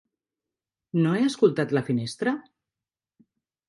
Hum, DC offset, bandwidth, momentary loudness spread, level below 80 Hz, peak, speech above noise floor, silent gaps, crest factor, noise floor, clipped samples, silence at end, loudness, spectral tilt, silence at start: none; under 0.1%; 11.5 kHz; 8 LU; -70 dBFS; -8 dBFS; over 66 dB; none; 20 dB; under -90 dBFS; under 0.1%; 1.3 s; -25 LUFS; -6.5 dB/octave; 0.95 s